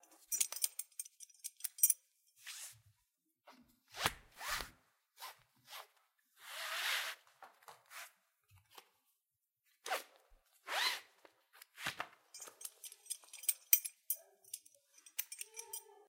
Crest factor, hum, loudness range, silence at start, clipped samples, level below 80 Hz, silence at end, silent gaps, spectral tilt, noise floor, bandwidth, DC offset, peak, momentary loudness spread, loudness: 34 dB; none; 7 LU; 0.3 s; under 0.1%; -72 dBFS; 0.15 s; none; 1 dB/octave; -88 dBFS; 17 kHz; under 0.1%; -10 dBFS; 22 LU; -39 LUFS